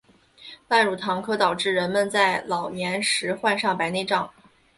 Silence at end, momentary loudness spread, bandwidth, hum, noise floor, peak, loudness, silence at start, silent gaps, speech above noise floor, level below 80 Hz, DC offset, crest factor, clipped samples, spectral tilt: 0.45 s; 7 LU; 11.5 kHz; none; -48 dBFS; -6 dBFS; -23 LUFS; 0.4 s; none; 25 dB; -64 dBFS; under 0.1%; 20 dB; under 0.1%; -3 dB/octave